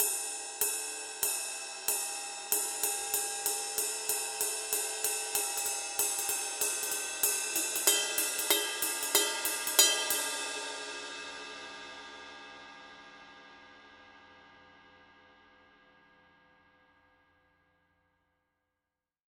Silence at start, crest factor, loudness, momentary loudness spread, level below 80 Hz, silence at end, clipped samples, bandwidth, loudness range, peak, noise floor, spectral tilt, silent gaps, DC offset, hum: 0 s; 30 dB; -30 LUFS; 18 LU; -76 dBFS; 4.4 s; under 0.1%; 18 kHz; 18 LU; -6 dBFS; -89 dBFS; 2 dB/octave; none; under 0.1%; none